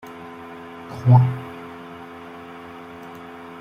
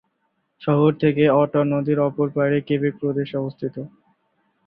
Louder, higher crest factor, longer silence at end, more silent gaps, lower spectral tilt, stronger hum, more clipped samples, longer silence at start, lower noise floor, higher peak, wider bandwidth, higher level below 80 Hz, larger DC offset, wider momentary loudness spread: first, -18 LUFS vs -21 LUFS; about the same, 20 dB vs 16 dB; second, 0.05 s vs 0.8 s; neither; second, -9 dB/octave vs -12 dB/octave; neither; neither; second, 0.05 s vs 0.6 s; second, -38 dBFS vs -71 dBFS; about the same, -4 dBFS vs -4 dBFS; about the same, 5.4 kHz vs 5 kHz; about the same, -58 dBFS vs -60 dBFS; neither; first, 22 LU vs 13 LU